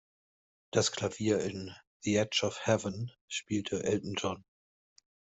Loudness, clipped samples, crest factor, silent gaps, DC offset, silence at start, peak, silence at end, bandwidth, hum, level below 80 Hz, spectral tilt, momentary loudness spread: -33 LUFS; under 0.1%; 22 dB; 1.87-2.00 s, 3.21-3.28 s; under 0.1%; 0.75 s; -12 dBFS; 0.9 s; 8.2 kHz; none; -68 dBFS; -4 dB/octave; 10 LU